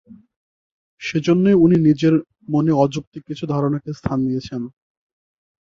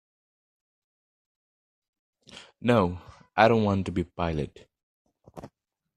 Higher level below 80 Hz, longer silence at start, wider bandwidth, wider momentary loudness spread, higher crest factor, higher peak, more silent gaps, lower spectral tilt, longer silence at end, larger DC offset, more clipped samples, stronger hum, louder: about the same, -50 dBFS vs -54 dBFS; second, 0.1 s vs 2.35 s; second, 7.4 kHz vs 12 kHz; second, 17 LU vs 26 LU; second, 16 dB vs 26 dB; about the same, -2 dBFS vs -4 dBFS; first, 0.36-0.97 s, 3.07-3.12 s vs 4.83-5.05 s; about the same, -8 dB/octave vs -7.5 dB/octave; first, 0.95 s vs 0.5 s; neither; neither; neither; first, -18 LUFS vs -26 LUFS